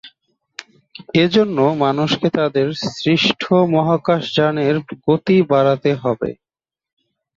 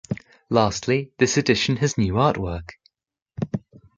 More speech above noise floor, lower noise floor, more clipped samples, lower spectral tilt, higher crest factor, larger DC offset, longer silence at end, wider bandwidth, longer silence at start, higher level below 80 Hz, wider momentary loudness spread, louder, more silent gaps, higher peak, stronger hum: second, 44 dB vs 58 dB; second, -60 dBFS vs -79 dBFS; neither; first, -6.5 dB/octave vs -5 dB/octave; about the same, 16 dB vs 20 dB; neither; first, 1.05 s vs 0.4 s; second, 7.6 kHz vs 9.4 kHz; about the same, 0.05 s vs 0.1 s; second, -56 dBFS vs -44 dBFS; second, 8 LU vs 13 LU; first, -17 LUFS vs -22 LUFS; second, none vs 3.22-3.26 s; about the same, -2 dBFS vs -2 dBFS; neither